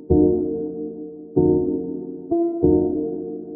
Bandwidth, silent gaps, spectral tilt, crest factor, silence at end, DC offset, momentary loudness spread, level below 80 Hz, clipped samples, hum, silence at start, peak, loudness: 1.5 kHz; none; -17 dB/octave; 16 dB; 0 s; under 0.1%; 13 LU; -38 dBFS; under 0.1%; none; 0 s; -4 dBFS; -22 LUFS